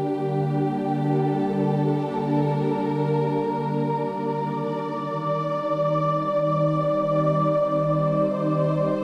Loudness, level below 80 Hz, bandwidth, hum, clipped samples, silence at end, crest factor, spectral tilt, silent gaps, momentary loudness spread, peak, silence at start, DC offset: -24 LUFS; -66 dBFS; 6.2 kHz; none; under 0.1%; 0 s; 12 dB; -9.5 dB/octave; none; 5 LU; -10 dBFS; 0 s; under 0.1%